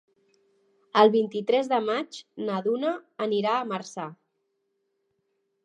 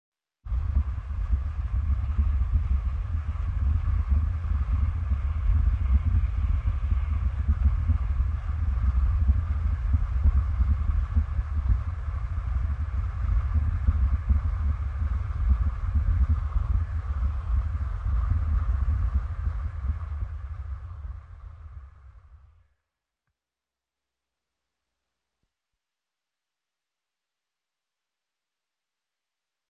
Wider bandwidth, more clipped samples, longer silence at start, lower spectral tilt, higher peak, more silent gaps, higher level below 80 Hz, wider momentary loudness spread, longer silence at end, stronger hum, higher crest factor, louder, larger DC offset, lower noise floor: first, 9.2 kHz vs 3.5 kHz; neither; first, 0.95 s vs 0.45 s; second, -5.5 dB/octave vs -9 dB/octave; first, -4 dBFS vs -10 dBFS; neither; second, -86 dBFS vs -28 dBFS; first, 16 LU vs 7 LU; second, 1.5 s vs 7.35 s; neither; first, 22 dB vs 16 dB; about the same, -26 LUFS vs -28 LUFS; neither; second, -76 dBFS vs -90 dBFS